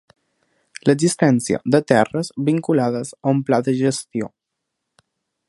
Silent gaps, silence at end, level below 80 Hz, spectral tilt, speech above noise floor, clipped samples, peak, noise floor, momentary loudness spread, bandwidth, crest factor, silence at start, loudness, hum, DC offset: none; 1.2 s; -60 dBFS; -6 dB/octave; 61 dB; under 0.1%; 0 dBFS; -79 dBFS; 8 LU; 11.5 kHz; 20 dB; 0.85 s; -19 LUFS; none; under 0.1%